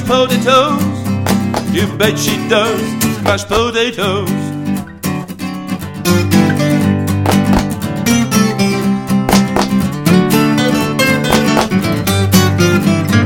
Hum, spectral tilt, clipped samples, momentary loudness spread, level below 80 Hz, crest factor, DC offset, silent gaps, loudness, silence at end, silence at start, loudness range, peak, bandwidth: none; -5 dB/octave; under 0.1%; 8 LU; -36 dBFS; 12 dB; under 0.1%; none; -13 LUFS; 0 s; 0 s; 4 LU; 0 dBFS; 17.5 kHz